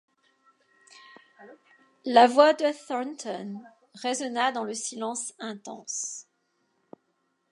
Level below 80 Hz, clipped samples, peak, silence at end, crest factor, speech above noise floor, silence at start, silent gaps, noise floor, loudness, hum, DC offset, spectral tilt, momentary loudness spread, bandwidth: -88 dBFS; under 0.1%; -4 dBFS; 1.3 s; 24 dB; 49 dB; 1.4 s; none; -74 dBFS; -26 LUFS; none; under 0.1%; -2.5 dB/octave; 20 LU; 11.5 kHz